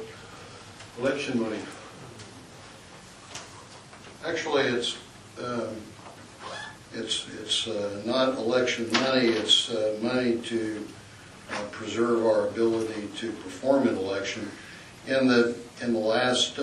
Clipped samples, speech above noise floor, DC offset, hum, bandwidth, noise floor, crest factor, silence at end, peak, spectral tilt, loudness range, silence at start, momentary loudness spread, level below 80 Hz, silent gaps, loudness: under 0.1%; 21 dB; under 0.1%; none; 12 kHz; -47 dBFS; 20 dB; 0 s; -8 dBFS; -3.5 dB/octave; 10 LU; 0 s; 22 LU; -64 dBFS; none; -27 LUFS